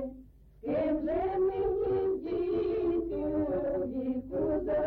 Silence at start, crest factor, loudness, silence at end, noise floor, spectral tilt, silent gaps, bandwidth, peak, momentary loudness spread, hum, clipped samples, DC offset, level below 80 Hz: 0 s; 10 dB; -31 LUFS; 0 s; -53 dBFS; -10.5 dB/octave; none; 4.5 kHz; -22 dBFS; 4 LU; none; under 0.1%; under 0.1%; -50 dBFS